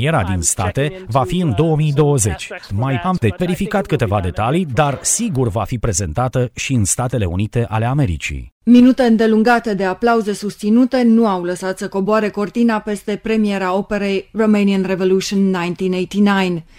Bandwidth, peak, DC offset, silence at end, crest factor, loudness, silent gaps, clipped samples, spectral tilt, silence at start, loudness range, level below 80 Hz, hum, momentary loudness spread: 16 kHz; 0 dBFS; under 0.1%; 0.15 s; 16 dB; -16 LUFS; 8.52-8.61 s; under 0.1%; -5.5 dB/octave; 0 s; 4 LU; -38 dBFS; none; 7 LU